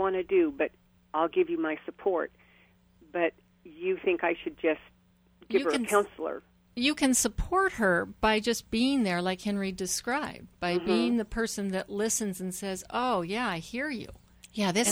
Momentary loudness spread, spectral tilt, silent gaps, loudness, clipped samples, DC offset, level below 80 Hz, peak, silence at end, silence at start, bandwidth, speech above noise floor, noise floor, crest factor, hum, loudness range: 9 LU; -3.5 dB/octave; none; -29 LUFS; under 0.1%; under 0.1%; -50 dBFS; -10 dBFS; 0 s; 0 s; over 20 kHz; 33 dB; -62 dBFS; 20 dB; none; 5 LU